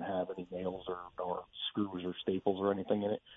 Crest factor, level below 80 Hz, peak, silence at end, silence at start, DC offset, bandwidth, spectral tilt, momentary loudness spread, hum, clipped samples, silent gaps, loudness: 20 dB; -70 dBFS; -16 dBFS; 0 s; 0 s; under 0.1%; 3.9 kHz; -4.5 dB/octave; 7 LU; none; under 0.1%; none; -37 LUFS